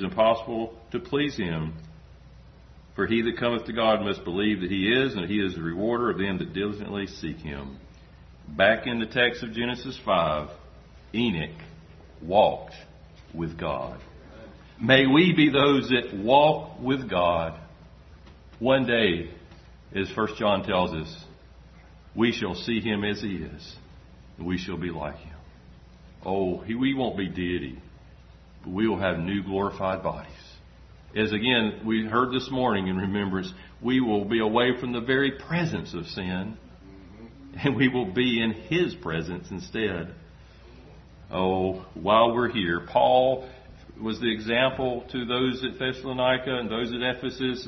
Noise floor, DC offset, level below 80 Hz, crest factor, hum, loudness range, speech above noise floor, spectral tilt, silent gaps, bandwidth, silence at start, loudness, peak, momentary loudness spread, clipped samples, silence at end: -50 dBFS; under 0.1%; -50 dBFS; 24 dB; none; 7 LU; 24 dB; -6.5 dB/octave; none; 6.4 kHz; 0 s; -26 LUFS; -2 dBFS; 17 LU; under 0.1%; 0 s